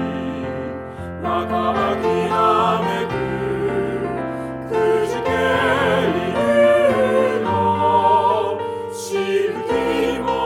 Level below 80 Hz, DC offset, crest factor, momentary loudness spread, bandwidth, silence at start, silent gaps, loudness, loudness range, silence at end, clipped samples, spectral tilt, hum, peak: -46 dBFS; under 0.1%; 16 dB; 11 LU; 16.5 kHz; 0 s; none; -19 LUFS; 4 LU; 0 s; under 0.1%; -5.5 dB/octave; none; -4 dBFS